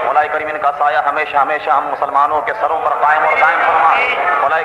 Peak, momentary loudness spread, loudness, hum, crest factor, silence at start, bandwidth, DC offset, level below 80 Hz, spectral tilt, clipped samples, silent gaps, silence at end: 0 dBFS; 5 LU; -14 LUFS; none; 14 dB; 0 s; 11.5 kHz; under 0.1%; -54 dBFS; -3.5 dB/octave; under 0.1%; none; 0 s